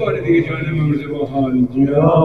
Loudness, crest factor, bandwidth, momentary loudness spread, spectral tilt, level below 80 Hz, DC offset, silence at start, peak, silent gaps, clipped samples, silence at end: -17 LUFS; 14 dB; 4.6 kHz; 6 LU; -10 dB/octave; -42 dBFS; 0.5%; 0 s; 0 dBFS; none; under 0.1%; 0 s